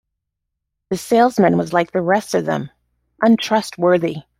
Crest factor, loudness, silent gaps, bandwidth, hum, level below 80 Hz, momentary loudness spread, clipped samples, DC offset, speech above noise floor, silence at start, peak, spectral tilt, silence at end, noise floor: 16 dB; -17 LUFS; none; 16 kHz; none; -58 dBFS; 10 LU; under 0.1%; under 0.1%; 62 dB; 0.9 s; -2 dBFS; -6 dB/octave; 0.2 s; -79 dBFS